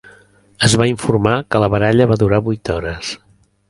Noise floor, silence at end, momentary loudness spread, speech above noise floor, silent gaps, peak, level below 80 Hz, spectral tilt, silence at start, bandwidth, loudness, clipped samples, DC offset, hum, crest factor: -48 dBFS; 0.55 s; 11 LU; 33 dB; none; 0 dBFS; -38 dBFS; -5.5 dB/octave; 0.05 s; 11.5 kHz; -15 LUFS; under 0.1%; under 0.1%; none; 16 dB